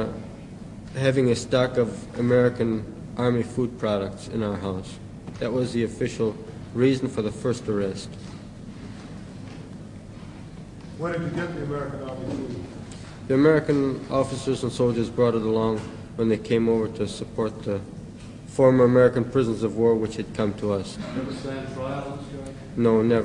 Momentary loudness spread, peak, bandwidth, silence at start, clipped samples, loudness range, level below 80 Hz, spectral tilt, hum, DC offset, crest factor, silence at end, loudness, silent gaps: 19 LU; -6 dBFS; 11 kHz; 0 s; under 0.1%; 10 LU; -50 dBFS; -7 dB/octave; none; under 0.1%; 20 dB; 0 s; -25 LUFS; none